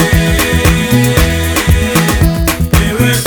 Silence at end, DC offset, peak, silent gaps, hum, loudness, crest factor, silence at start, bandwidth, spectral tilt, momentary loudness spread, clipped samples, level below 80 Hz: 0 s; under 0.1%; 0 dBFS; none; none; -11 LUFS; 10 dB; 0 s; 19.5 kHz; -5 dB/octave; 2 LU; under 0.1%; -16 dBFS